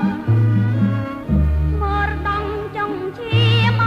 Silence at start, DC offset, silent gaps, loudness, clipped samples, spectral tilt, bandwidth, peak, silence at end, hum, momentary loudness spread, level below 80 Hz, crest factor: 0 s; under 0.1%; none; -19 LUFS; under 0.1%; -8 dB/octave; 6 kHz; -4 dBFS; 0 s; none; 9 LU; -26 dBFS; 12 dB